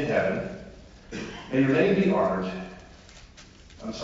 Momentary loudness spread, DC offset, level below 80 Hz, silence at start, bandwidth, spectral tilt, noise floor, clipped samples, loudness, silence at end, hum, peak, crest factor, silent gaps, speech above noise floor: 21 LU; under 0.1%; -52 dBFS; 0 s; 7.8 kHz; -7 dB/octave; -50 dBFS; under 0.1%; -25 LUFS; 0 s; none; -10 dBFS; 18 dB; none; 25 dB